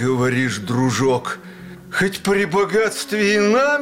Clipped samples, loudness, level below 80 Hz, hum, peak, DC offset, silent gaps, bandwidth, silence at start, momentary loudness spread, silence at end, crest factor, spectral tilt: under 0.1%; -18 LUFS; -54 dBFS; none; -8 dBFS; 0.2%; none; 16.5 kHz; 0 s; 12 LU; 0 s; 10 dB; -5 dB/octave